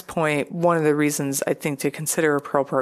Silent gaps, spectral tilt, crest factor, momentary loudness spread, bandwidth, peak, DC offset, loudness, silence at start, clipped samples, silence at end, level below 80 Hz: none; -4.5 dB/octave; 18 dB; 5 LU; 15 kHz; -4 dBFS; under 0.1%; -22 LUFS; 0.1 s; under 0.1%; 0 s; -62 dBFS